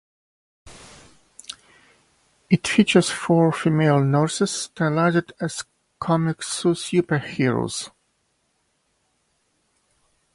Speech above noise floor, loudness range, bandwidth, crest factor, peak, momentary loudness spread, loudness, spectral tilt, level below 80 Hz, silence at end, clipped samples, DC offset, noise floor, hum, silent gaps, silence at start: 49 dB; 6 LU; 11.5 kHz; 20 dB; -2 dBFS; 19 LU; -21 LUFS; -5.5 dB/octave; -60 dBFS; 2.45 s; under 0.1%; under 0.1%; -69 dBFS; none; none; 0.65 s